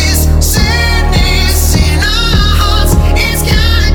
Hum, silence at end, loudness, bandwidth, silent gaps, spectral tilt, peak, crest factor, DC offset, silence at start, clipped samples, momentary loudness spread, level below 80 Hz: none; 0 s; -10 LUFS; over 20 kHz; none; -4 dB/octave; 0 dBFS; 8 dB; under 0.1%; 0 s; under 0.1%; 1 LU; -10 dBFS